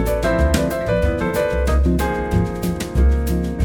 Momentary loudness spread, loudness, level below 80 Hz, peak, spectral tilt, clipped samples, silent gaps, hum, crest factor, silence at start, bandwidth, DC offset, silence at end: 4 LU; -19 LUFS; -22 dBFS; -2 dBFS; -6.5 dB/octave; under 0.1%; none; none; 14 dB; 0 s; 17.5 kHz; under 0.1%; 0 s